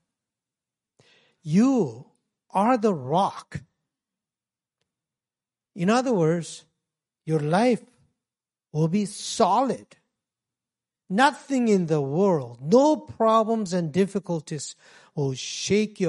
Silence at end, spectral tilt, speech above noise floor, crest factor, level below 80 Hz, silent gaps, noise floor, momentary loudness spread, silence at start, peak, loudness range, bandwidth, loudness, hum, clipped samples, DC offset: 0 s; -6 dB/octave; over 67 dB; 20 dB; -68 dBFS; none; under -90 dBFS; 13 LU; 1.45 s; -4 dBFS; 6 LU; 11.5 kHz; -24 LUFS; none; under 0.1%; under 0.1%